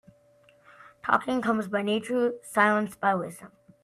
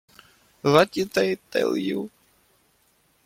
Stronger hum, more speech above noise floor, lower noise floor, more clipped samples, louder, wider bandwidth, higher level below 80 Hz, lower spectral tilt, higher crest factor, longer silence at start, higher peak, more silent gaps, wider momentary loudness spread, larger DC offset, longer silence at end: neither; second, 34 dB vs 42 dB; second, -60 dBFS vs -64 dBFS; neither; second, -26 LUFS vs -23 LUFS; about the same, 15 kHz vs 16.5 kHz; second, -70 dBFS vs -64 dBFS; about the same, -5 dB/octave vs -5.5 dB/octave; about the same, 22 dB vs 22 dB; first, 1.05 s vs 0.65 s; about the same, -6 dBFS vs -4 dBFS; neither; about the same, 10 LU vs 11 LU; neither; second, 0.35 s vs 1.2 s